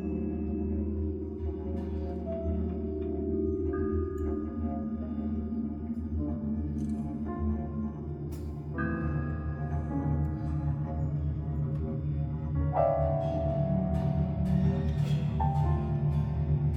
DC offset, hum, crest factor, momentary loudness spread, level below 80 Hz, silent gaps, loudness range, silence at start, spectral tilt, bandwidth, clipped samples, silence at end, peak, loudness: under 0.1%; none; 16 dB; 7 LU; -38 dBFS; none; 5 LU; 0 s; -10.5 dB/octave; 5.4 kHz; under 0.1%; 0 s; -14 dBFS; -32 LUFS